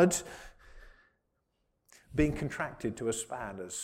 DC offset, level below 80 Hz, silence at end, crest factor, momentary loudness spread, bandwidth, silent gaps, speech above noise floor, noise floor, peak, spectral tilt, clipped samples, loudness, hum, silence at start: under 0.1%; -50 dBFS; 0 s; 22 dB; 16 LU; 16 kHz; none; 46 dB; -79 dBFS; -14 dBFS; -5 dB/octave; under 0.1%; -34 LUFS; none; 0 s